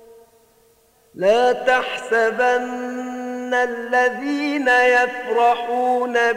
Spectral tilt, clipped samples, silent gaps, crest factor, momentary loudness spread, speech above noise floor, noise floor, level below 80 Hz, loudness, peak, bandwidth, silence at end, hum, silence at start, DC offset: -3.5 dB/octave; under 0.1%; none; 16 dB; 11 LU; 38 dB; -57 dBFS; -64 dBFS; -19 LUFS; -4 dBFS; 15.5 kHz; 0 s; none; 1.15 s; under 0.1%